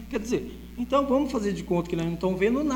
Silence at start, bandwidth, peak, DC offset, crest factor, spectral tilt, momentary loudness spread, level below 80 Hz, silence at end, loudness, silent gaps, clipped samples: 0 s; 20 kHz; -10 dBFS; under 0.1%; 16 dB; -6.5 dB/octave; 7 LU; -44 dBFS; 0 s; -27 LUFS; none; under 0.1%